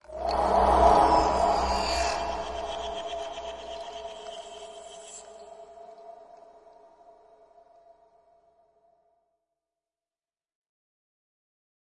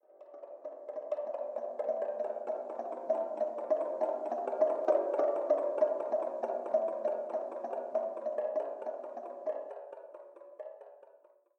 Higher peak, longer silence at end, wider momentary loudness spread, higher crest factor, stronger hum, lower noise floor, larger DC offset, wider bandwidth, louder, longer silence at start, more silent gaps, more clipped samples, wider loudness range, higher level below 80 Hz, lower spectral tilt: first, -8 dBFS vs -16 dBFS; first, 5.7 s vs 0.4 s; first, 27 LU vs 18 LU; about the same, 22 dB vs 20 dB; neither; first, under -90 dBFS vs -63 dBFS; neither; first, 11.5 kHz vs 6.4 kHz; first, -25 LUFS vs -35 LUFS; about the same, 0.1 s vs 0.15 s; neither; neither; first, 25 LU vs 7 LU; first, -44 dBFS vs under -90 dBFS; second, -4.5 dB/octave vs -6 dB/octave